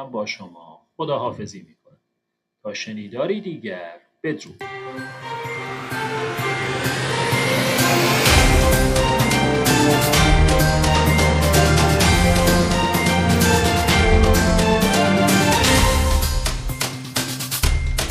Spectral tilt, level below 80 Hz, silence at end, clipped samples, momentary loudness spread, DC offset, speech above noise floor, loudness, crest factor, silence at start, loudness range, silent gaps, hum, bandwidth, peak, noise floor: -4.5 dB/octave; -26 dBFS; 0 s; under 0.1%; 15 LU; under 0.1%; 49 dB; -18 LUFS; 18 dB; 0 s; 14 LU; none; none; 15.5 kHz; 0 dBFS; -77 dBFS